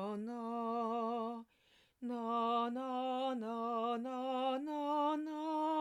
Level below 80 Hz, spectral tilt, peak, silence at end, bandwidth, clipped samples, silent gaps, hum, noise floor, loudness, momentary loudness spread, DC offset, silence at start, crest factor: -88 dBFS; -6 dB/octave; -24 dBFS; 0 s; 13 kHz; under 0.1%; none; none; -72 dBFS; -38 LUFS; 7 LU; under 0.1%; 0 s; 14 dB